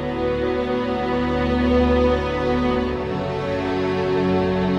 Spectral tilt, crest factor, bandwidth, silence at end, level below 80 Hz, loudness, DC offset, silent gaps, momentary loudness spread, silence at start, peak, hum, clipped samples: -7.5 dB/octave; 14 dB; 8.2 kHz; 0 s; -32 dBFS; -21 LUFS; under 0.1%; none; 6 LU; 0 s; -6 dBFS; none; under 0.1%